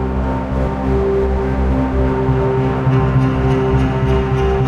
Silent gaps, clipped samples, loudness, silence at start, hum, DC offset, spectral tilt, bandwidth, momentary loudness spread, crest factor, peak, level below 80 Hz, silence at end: none; under 0.1%; -16 LUFS; 0 s; none; under 0.1%; -9 dB/octave; 7 kHz; 4 LU; 12 dB; -4 dBFS; -22 dBFS; 0 s